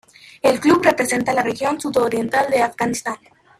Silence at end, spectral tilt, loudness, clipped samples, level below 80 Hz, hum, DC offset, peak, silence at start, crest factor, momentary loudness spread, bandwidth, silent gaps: 0.45 s; -4 dB/octave; -18 LUFS; under 0.1%; -56 dBFS; none; under 0.1%; -2 dBFS; 0.45 s; 18 dB; 7 LU; 15.5 kHz; none